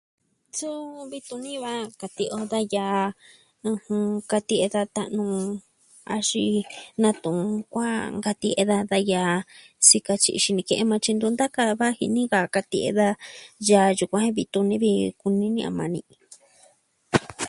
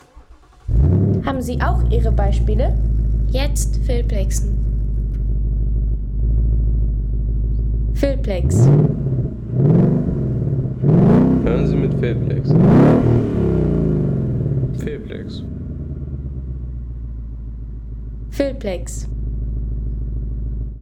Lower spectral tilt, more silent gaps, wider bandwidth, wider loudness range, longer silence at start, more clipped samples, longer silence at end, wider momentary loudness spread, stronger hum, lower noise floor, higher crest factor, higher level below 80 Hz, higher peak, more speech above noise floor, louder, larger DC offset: second, -3.5 dB/octave vs -8 dB/octave; neither; about the same, 11.5 kHz vs 12.5 kHz; second, 7 LU vs 12 LU; first, 0.55 s vs 0.15 s; neither; about the same, 0 s vs 0 s; second, 13 LU vs 16 LU; neither; first, -60 dBFS vs -44 dBFS; first, 24 dB vs 14 dB; second, -62 dBFS vs -22 dBFS; about the same, -2 dBFS vs -4 dBFS; first, 36 dB vs 28 dB; second, -23 LUFS vs -19 LUFS; neither